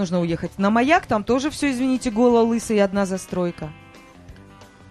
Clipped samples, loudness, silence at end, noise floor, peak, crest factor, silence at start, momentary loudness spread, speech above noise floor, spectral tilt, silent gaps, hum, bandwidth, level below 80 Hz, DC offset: under 0.1%; -20 LUFS; 0.25 s; -45 dBFS; -2 dBFS; 18 dB; 0 s; 9 LU; 25 dB; -5.5 dB/octave; none; none; 13.5 kHz; -48 dBFS; under 0.1%